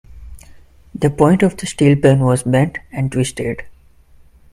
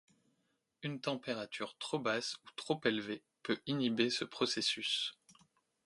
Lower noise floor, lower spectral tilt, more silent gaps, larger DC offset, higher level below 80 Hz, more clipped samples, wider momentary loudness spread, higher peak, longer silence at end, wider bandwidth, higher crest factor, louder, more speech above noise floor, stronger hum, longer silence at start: second, -46 dBFS vs -81 dBFS; first, -6.5 dB/octave vs -3.5 dB/octave; neither; neither; first, -42 dBFS vs -80 dBFS; neither; about the same, 12 LU vs 10 LU; first, 0 dBFS vs -18 dBFS; first, 0.8 s vs 0.55 s; first, 13 kHz vs 11.5 kHz; second, 16 dB vs 22 dB; first, -16 LUFS vs -37 LUFS; second, 32 dB vs 43 dB; neither; second, 0.15 s vs 0.8 s